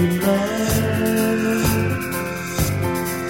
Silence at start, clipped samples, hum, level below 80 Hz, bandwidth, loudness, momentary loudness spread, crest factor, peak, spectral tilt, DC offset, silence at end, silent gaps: 0 s; under 0.1%; none; -38 dBFS; 17 kHz; -20 LUFS; 5 LU; 14 dB; -6 dBFS; -5.5 dB/octave; 0.3%; 0 s; none